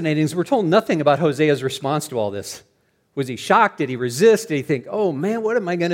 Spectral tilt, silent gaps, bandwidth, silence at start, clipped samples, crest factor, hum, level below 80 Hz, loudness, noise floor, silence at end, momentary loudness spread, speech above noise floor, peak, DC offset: -5.5 dB/octave; none; 16.5 kHz; 0 s; under 0.1%; 18 dB; none; -66 dBFS; -19 LUFS; -64 dBFS; 0 s; 11 LU; 45 dB; -2 dBFS; under 0.1%